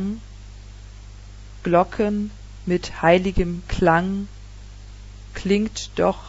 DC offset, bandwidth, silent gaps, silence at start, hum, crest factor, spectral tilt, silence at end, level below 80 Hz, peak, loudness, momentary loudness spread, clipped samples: under 0.1%; 8 kHz; none; 0 s; 50 Hz at -40 dBFS; 20 dB; -6 dB/octave; 0 s; -36 dBFS; -2 dBFS; -22 LUFS; 24 LU; under 0.1%